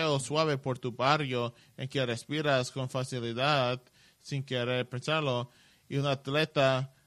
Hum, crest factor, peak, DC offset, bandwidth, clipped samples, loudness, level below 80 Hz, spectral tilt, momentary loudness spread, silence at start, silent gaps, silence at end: none; 22 dB; -10 dBFS; under 0.1%; 13.5 kHz; under 0.1%; -31 LUFS; -68 dBFS; -5 dB/octave; 10 LU; 0 s; none; 0.2 s